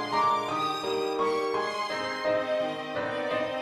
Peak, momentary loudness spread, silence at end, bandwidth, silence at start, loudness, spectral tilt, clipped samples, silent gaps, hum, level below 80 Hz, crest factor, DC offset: -14 dBFS; 5 LU; 0 s; 14.5 kHz; 0 s; -29 LUFS; -4 dB/octave; under 0.1%; none; none; -68 dBFS; 14 dB; under 0.1%